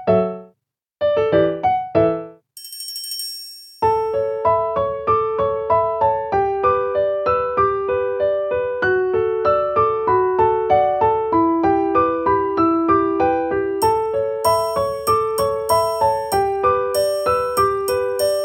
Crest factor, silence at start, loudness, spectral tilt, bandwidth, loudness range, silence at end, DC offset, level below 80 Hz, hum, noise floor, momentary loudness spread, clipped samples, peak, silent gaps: 14 dB; 0 s; -18 LUFS; -5 dB/octave; 18.5 kHz; 4 LU; 0 s; under 0.1%; -46 dBFS; none; -70 dBFS; 5 LU; under 0.1%; -4 dBFS; none